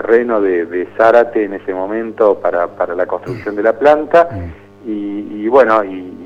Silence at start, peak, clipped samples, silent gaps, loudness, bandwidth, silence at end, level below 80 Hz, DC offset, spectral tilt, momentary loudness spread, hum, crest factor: 0 s; 0 dBFS; under 0.1%; none; -14 LUFS; 7.6 kHz; 0 s; -48 dBFS; under 0.1%; -7.5 dB/octave; 13 LU; 50 Hz at -45 dBFS; 14 dB